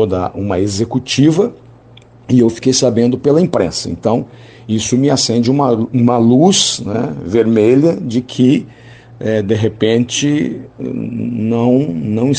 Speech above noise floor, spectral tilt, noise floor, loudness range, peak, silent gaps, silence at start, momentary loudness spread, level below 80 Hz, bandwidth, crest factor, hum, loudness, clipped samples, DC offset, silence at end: 28 dB; -5.5 dB/octave; -41 dBFS; 4 LU; 0 dBFS; none; 0 s; 9 LU; -48 dBFS; 9.6 kHz; 14 dB; none; -14 LUFS; under 0.1%; under 0.1%; 0 s